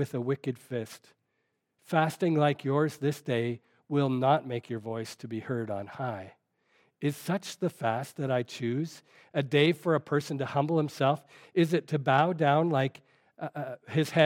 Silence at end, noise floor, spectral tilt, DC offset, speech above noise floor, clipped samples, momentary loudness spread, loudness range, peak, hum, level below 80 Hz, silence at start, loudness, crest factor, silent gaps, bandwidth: 0 s; -79 dBFS; -6.5 dB/octave; under 0.1%; 50 dB; under 0.1%; 12 LU; 6 LU; -8 dBFS; none; -80 dBFS; 0 s; -30 LUFS; 22 dB; none; 16.5 kHz